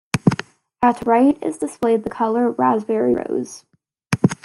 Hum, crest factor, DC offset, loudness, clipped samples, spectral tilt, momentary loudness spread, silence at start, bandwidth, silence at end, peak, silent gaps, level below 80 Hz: none; 18 dB; under 0.1%; -19 LUFS; under 0.1%; -6.5 dB/octave; 10 LU; 0.15 s; 12 kHz; 0.1 s; 0 dBFS; none; -54 dBFS